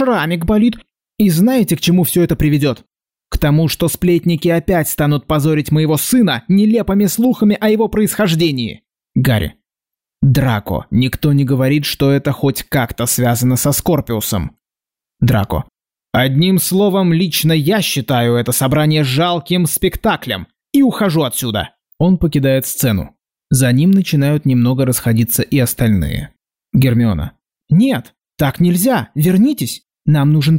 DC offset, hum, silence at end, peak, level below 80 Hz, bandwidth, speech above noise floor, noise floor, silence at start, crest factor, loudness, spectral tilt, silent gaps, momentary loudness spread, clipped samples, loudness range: 0.2%; none; 0 s; -4 dBFS; -36 dBFS; 16.5 kHz; 75 dB; -89 dBFS; 0 s; 10 dB; -14 LUFS; -5.5 dB/octave; none; 7 LU; under 0.1%; 3 LU